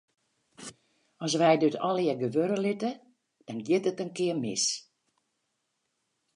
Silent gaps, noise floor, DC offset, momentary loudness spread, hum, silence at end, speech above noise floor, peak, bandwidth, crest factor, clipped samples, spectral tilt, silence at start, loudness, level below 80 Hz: none; -79 dBFS; under 0.1%; 22 LU; none; 1.55 s; 52 dB; -10 dBFS; 11 kHz; 20 dB; under 0.1%; -4 dB/octave; 0.6 s; -28 LUFS; -80 dBFS